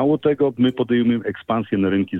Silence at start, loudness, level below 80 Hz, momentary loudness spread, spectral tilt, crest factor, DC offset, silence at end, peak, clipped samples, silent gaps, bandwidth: 0 s; -20 LUFS; -58 dBFS; 6 LU; -9.5 dB/octave; 12 dB; under 0.1%; 0 s; -6 dBFS; under 0.1%; none; 4 kHz